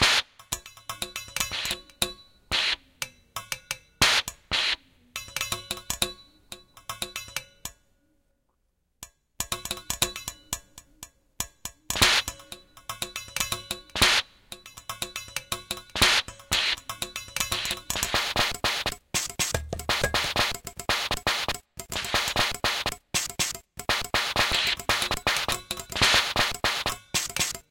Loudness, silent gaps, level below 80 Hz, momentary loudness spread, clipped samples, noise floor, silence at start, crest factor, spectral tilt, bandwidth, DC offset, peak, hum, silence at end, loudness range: -26 LUFS; none; -46 dBFS; 19 LU; under 0.1%; -73 dBFS; 0 s; 26 dB; -1 dB/octave; 17 kHz; under 0.1%; -4 dBFS; none; 0.1 s; 9 LU